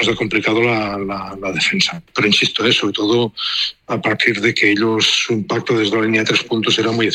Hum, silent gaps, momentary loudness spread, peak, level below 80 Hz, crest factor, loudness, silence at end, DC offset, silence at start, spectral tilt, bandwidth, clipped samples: none; none; 6 LU; -2 dBFS; -52 dBFS; 16 dB; -16 LUFS; 0 s; under 0.1%; 0 s; -3.5 dB/octave; 12.5 kHz; under 0.1%